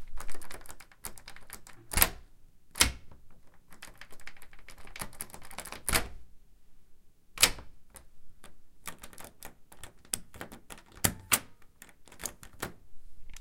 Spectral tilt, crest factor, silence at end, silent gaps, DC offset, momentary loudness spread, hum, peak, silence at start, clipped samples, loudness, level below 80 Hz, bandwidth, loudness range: -1 dB/octave; 34 dB; 0 s; none; under 0.1%; 25 LU; none; -2 dBFS; 0 s; under 0.1%; -31 LUFS; -46 dBFS; 17 kHz; 6 LU